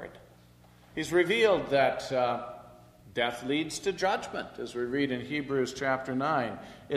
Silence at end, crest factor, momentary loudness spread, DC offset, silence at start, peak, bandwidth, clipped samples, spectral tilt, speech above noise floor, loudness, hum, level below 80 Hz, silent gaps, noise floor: 0 s; 18 dB; 13 LU; under 0.1%; 0 s; -12 dBFS; 14.5 kHz; under 0.1%; -4.5 dB/octave; 28 dB; -29 LUFS; 60 Hz at -60 dBFS; -62 dBFS; none; -57 dBFS